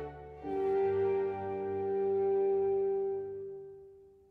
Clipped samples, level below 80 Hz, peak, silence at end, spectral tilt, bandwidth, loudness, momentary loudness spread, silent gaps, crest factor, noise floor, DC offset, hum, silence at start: under 0.1%; -64 dBFS; -24 dBFS; 0.2 s; -9.5 dB/octave; 3.7 kHz; -32 LUFS; 15 LU; none; 10 dB; -56 dBFS; under 0.1%; none; 0 s